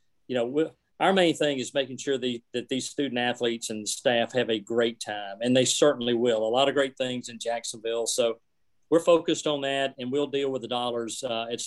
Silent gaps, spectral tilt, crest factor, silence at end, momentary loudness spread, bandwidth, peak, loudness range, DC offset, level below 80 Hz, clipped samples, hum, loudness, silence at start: none; -3.5 dB/octave; 20 dB; 0 s; 9 LU; 12.5 kHz; -8 dBFS; 3 LU; under 0.1%; -74 dBFS; under 0.1%; none; -27 LUFS; 0.3 s